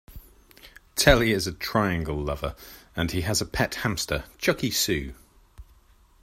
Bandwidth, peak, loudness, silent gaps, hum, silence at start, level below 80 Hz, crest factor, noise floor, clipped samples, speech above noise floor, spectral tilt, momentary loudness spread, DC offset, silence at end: 16 kHz; -2 dBFS; -25 LUFS; none; none; 0.1 s; -38 dBFS; 26 dB; -57 dBFS; under 0.1%; 32 dB; -4 dB/octave; 13 LU; under 0.1%; 0.6 s